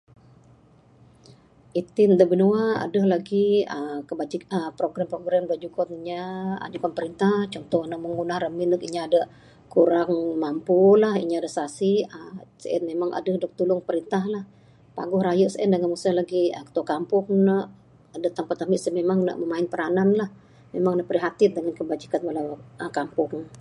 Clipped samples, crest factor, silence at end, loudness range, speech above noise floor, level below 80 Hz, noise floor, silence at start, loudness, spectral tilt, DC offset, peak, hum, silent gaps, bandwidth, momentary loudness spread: under 0.1%; 20 dB; 0 s; 5 LU; 32 dB; -66 dBFS; -55 dBFS; 1.75 s; -24 LUFS; -7 dB/octave; under 0.1%; -4 dBFS; none; none; 11.5 kHz; 11 LU